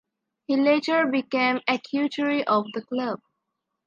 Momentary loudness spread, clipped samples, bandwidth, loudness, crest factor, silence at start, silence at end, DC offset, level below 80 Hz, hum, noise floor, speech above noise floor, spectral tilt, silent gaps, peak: 9 LU; under 0.1%; 7.4 kHz; -24 LUFS; 18 dB; 0.5 s; 0.7 s; under 0.1%; -78 dBFS; none; -81 dBFS; 57 dB; -5.5 dB/octave; none; -8 dBFS